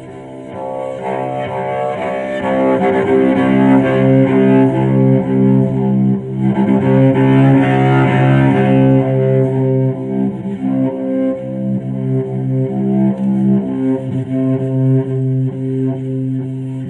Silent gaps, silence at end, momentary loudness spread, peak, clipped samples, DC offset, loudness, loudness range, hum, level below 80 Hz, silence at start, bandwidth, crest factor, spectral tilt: none; 0 s; 9 LU; 0 dBFS; under 0.1%; under 0.1%; -14 LUFS; 6 LU; none; -48 dBFS; 0 s; 4 kHz; 12 dB; -10 dB/octave